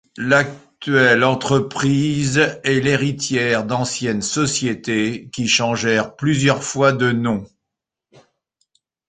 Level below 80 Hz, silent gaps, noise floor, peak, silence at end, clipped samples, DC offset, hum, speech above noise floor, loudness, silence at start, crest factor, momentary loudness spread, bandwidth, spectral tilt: -52 dBFS; none; -82 dBFS; -2 dBFS; 1.6 s; under 0.1%; under 0.1%; none; 65 dB; -18 LUFS; 0.15 s; 18 dB; 6 LU; 9.6 kHz; -4.5 dB/octave